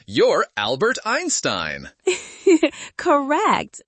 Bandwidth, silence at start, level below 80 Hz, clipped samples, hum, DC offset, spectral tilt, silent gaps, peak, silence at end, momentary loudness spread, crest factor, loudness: 8.8 kHz; 0.1 s; -58 dBFS; under 0.1%; none; under 0.1%; -3 dB/octave; none; -4 dBFS; 0.1 s; 7 LU; 16 dB; -20 LUFS